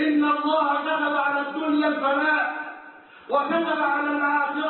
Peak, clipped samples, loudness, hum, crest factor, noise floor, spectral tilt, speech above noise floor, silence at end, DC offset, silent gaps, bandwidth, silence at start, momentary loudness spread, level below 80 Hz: -10 dBFS; under 0.1%; -23 LUFS; none; 12 dB; -46 dBFS; -8 dB/octave; 23 dB; 0 s; under 0.1%; none; 4.3 kHz; 0 s; 5 LU; -74 dBFS